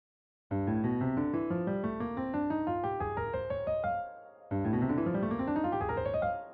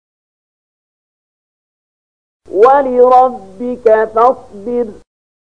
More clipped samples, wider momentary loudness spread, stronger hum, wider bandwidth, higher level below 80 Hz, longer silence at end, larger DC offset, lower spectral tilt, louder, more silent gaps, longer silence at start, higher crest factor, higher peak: neither; second, 5 LU vs 15 LU; neither; second, 4.7 kHz vs 7 kHz; about the same, -54 dBFS vs -52 dBFS; second, 0 s vs 0.65 s; second, under 0.1% vs 0.8%; first, -8 dB/octave vs -6.5 dB/octave; second, -33 LUFS vs -11 LUFS; neither; second, 0.5 s vs 2.5 s; about the same, 12 dB vs 14 dB; second, -20 dBFS vs 0 dBFS